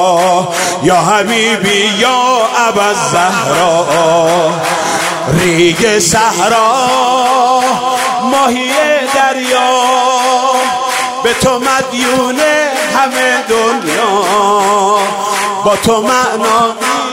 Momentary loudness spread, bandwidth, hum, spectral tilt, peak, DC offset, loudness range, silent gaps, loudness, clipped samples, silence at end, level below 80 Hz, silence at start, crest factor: 3 LU; 16 kHz; none; -3 dB/octave; 0 dBFS; under 0.1%; 1 LU; none; -10 LUFS; under 0.1%; 0 s; -44 dBFS; 0 s; 10 dB